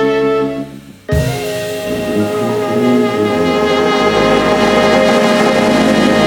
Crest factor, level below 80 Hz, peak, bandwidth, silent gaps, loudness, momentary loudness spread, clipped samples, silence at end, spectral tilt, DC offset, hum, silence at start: 12 dB; -34 dBFS; 0 dBFS; 19 kHz; none; -13 LUFS; 9 LU; under 0.1%; 0 s; -5 dB/octave; under 0.1%; none; 0 s